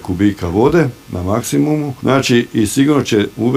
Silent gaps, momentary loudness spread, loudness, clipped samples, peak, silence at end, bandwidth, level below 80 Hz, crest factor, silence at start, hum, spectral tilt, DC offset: none; 6 LU; -15 LUFS; under 0.1%; 0 dBFS; 0 s; 16 kHz; -40 dBFS; 14 dB; 0 s; none; -5.5 dB/octave; under 0.1%